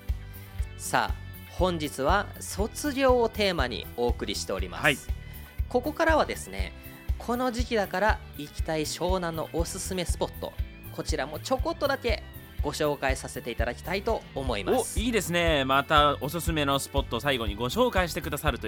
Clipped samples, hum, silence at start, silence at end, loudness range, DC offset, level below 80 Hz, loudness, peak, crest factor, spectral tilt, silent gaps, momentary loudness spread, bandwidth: under 0.1%; none; 0 s; 0 s; 5 LU; under 0.1%; -36 dBFS; -28 LUFS; -6 dBFS; 22 dB; -4.5 dB/octave; none; 13 LU; 19 kHz